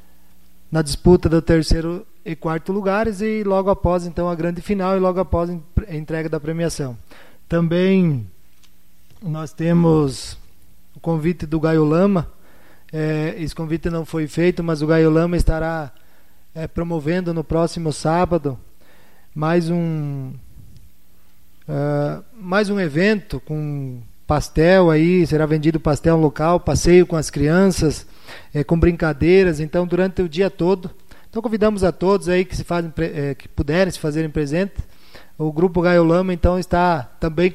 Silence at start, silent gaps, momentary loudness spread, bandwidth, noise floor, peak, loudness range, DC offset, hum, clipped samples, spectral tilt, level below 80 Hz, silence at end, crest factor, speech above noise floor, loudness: 0.7 s; none; 13 LU; 14 kHz; -55 dBFS; -2 dBFS; 6 LU; 1%; none; under 0.1%; -7 dB/octave; -32 dBFS; 0 s; 18 dB; 37 dB; -19 LUFS